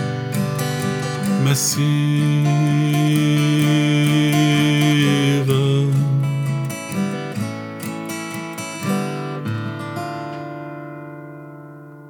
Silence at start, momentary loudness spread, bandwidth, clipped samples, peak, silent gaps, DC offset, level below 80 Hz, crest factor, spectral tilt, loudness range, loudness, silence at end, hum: 0 s; 16 LU; 18.5 kHz; under 0.1%; -2 dBFS; none; under 0.1%; -68 dBFS; 16 dB; -5.5 dB/octave; 10 LU; -19 LUFS; 0 s; none